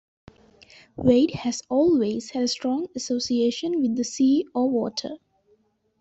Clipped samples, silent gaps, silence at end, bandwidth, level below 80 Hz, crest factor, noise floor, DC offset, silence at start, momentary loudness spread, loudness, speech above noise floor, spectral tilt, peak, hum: under 0.1%; none; 0.85 s; 8.2 kHz; -58 dBFS; 18 dB; -65 dBFS; under 0.1%; 1 s; 9 LU; -23 LUFS; 42 dB; -5 dB/octave; -6 dBFS; none